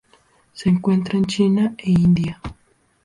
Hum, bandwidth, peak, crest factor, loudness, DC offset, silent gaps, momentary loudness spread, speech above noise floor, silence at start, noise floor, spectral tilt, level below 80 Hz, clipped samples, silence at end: none; 11 kHz; -6 dBFS; 14 dB; -19 LUFS; under 0.1%; none; 11 LU; 39 dB; 0.55 s; -57 dBFS; -7.5 dB/octave; -46 dBFS; under 0.1%; 0.5 s